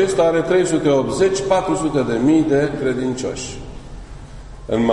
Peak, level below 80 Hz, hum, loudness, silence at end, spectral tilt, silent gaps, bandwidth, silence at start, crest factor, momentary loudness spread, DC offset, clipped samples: -2 dBFS; -40 dBFS; none; -18 LUFS; 0 s; -5.5 dB/octave; none; 11 kHz; 0 s; 16 dB; 22 LU; under 0.1%; under 0.1%